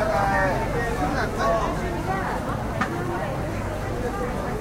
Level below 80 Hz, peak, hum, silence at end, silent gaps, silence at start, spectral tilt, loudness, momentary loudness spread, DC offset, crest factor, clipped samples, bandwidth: -34 dBFS; -10 dBFS; none; 0 s; none; 0 s; -6 dB/octave; -25 LUFS; 6 LU; under 0.1%; 16 dB; under 0.1%; 16 kHz